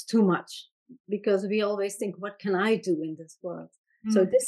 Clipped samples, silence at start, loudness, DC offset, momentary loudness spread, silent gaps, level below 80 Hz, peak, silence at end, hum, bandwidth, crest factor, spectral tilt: under 0.1%; 0 s; -27 LUFS; under 0.1%; 15 LU; 0.71-0.86 s, 1.00-1.04 s, 3.78-3.84 s; -78 dBFS; -10 dBFS; 0 s; none; 12.5 kHz; 16 dB; -5.5 dB/octave